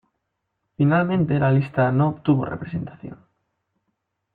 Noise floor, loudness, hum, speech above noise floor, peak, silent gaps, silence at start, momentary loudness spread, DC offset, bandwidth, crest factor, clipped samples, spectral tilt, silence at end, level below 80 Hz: -77 dBFS; -21 LUFS; none; 57 dB; -6 dBFS; none; 0.8 s; 14 LU; under 0.1%; 4.6 kHz; 16 dB; under 0.1%; -11 dB/octave; 1.2 s; -56 dBFS